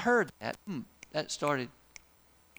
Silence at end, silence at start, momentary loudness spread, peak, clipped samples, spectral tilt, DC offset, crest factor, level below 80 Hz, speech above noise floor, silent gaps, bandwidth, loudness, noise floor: 0.9 s; 0 s; 25 LU; -16 dBFS; under 0.1%; -4 dB/octave; under 0.1%; 18 dB; -68 dBFS; 32 dB; none; over 20 kHz; -34 LUFS; -64 dBFS